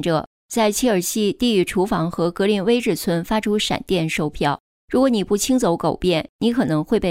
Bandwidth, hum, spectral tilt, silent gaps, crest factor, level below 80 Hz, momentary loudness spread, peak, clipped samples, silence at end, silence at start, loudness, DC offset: 16 kHz; none; -5 dB/octave; 0.27-0.49 s, 4.60-4.88 s, 6.29-6.39 s; 14 dB; -44 dBFS; 4 LU; -6 dBFS; under 0.1%; 0 s; 0 s; -20 LUFS; under 0.1%